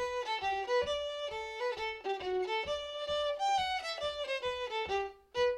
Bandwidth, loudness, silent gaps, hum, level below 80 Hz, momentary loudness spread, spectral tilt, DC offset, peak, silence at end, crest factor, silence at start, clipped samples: 12.5 kHz; -35 LUFS; none; none; -60 dBFS; 5 LU; -2.5 dB/octave; under 0.1%; -20 dBFS; 0 s; 14 dB; 0 s; under 0.1%